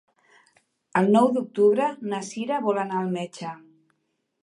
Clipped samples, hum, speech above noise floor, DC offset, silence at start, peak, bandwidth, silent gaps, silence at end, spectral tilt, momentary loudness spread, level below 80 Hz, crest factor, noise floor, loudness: under 0.1%; none; 52 dB; under 0.1%; 0.95 s; -8 dBFS; 11 kHz; none; 0.9 s; -6.5 dB/octave; 15 LU; -76 dBFS; 18 dB; -75 dBFS; -24 LUFS